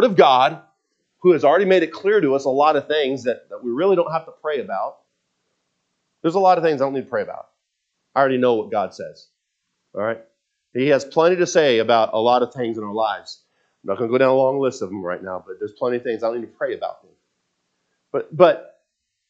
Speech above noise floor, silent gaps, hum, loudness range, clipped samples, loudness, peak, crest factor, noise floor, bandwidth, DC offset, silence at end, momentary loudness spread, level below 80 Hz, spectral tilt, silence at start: 57 dB; none; none; 6 LU; under 0.1%; -19 LUFS; 0 dBFS; 20 dB; -75 dBFS; 7.8 kHz; under 0.1%; 0.65 s; 14 LU; -76 dBFS; -5.5 dB/octave; 0 s